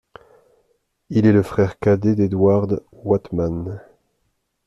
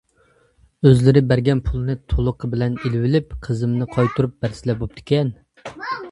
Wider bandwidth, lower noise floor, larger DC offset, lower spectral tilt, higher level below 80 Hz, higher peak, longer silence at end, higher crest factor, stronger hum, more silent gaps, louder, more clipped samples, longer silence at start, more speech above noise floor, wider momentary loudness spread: about the same, 11.5 kHz vs 11 kHz; first, -70 dBFS vs -58 dBFS; neither; about the same, -9.5 dB/octave vs -8.5 dB/octave; second, -48 dBFS vs -34 dBFS; second, -4 dBFS vs 0 dBFS; first, 0.9 s vs 0 s; about the same, 16 dB vs 20 dB; neither; neither; about the same, -19 LUFS vs -20 LUFS; neither; first, 1.1 s vs 0.8 s; first, 53 dB vs 40 dB; about the same, 10 LU vs 12 LU